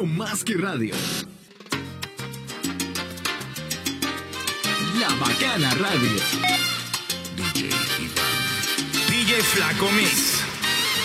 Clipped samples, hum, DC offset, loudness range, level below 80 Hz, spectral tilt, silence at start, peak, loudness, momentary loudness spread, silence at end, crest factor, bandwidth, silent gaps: under 0.1%; none; under 0.1%; 9 LU; -54 dBFS; -2.5 dB/octave; 0 s; -4 dBFS; -22 LUFS; 12 LU; 0 s; 20 dB; 17.5 kHz; none